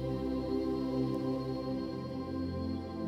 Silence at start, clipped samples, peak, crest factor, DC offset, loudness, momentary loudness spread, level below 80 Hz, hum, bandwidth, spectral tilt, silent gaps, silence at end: 0 s; under 0.1%; -20 dBFS; 14 dB; under 0.1%; -36 LUFS; 5 LU; -52 dBFS; none; 11 kHz; -8.5 dB/octave; none; 0 s